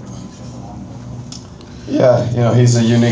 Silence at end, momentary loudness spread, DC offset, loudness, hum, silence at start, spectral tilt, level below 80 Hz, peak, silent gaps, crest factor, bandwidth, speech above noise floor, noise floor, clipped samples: 0 s; 20 LU; under 0.1%; -13 LUFS; none; 0 s; -6.5 dB/octave; -42 dBFS; 0 dBFS; none; 14 dB; 8 kHz; 22 dB; -33 dBFS; under 0.1%